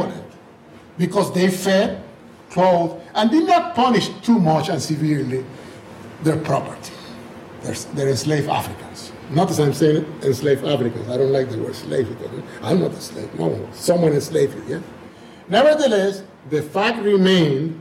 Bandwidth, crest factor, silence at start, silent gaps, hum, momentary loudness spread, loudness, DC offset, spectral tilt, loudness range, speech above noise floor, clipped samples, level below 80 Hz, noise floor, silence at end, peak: 16 kHz; 14 dB; 0 s; none; none; 18 LU; -19 LUFS; under 0.1%; -6 dB/octave; 6 LU; 25 dB; under 0.1%; -56 dBFS; -44 dBFS; 0 s; -6 dBFS